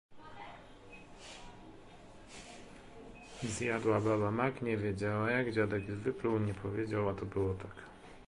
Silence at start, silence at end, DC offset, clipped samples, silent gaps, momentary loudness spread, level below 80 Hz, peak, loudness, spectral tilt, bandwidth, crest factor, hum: 0.1 s; 0 s; under 0.1%; under 0.1%; none; 22 LU; -58 dBFS; -16 dBFS; -35 LUFS; -6.5 dB/octave; 11.5 kHz; 20 dB; none